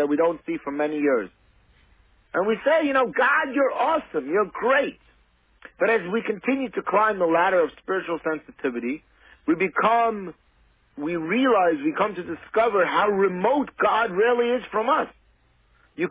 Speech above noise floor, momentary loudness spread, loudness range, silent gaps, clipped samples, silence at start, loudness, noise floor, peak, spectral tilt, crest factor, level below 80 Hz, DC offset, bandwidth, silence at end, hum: 39 dB; 10 LU; 3 LU; none; under 0.1%; 0 s; -23 LUFS; -61 dBFS; -8 dBFS; -9 dB/octave; 16 dB; -62 dBFS; under 0.1%; 4 kHz; 0 s; none